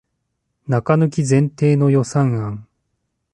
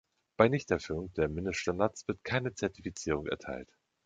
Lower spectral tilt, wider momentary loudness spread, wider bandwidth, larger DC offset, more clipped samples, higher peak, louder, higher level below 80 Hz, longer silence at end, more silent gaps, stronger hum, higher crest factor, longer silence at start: first, -7.5 dB/octave vs -5.5 dB/octave; about the same, 12 LU vs 11 LU; first, 10.5 kHz vs 9.2 kHz; neither; neither; about the same, -4 dBFS vs -6 dBFS; first, -17 LUFS vs -33 LUFS; about the same, -54 dBFS vs -52 dBFS; first, 0.7 s vs 0.4 s; neither; neither; second, 16 dB vs 26 dB; first, 0.7 s vs 0.4 s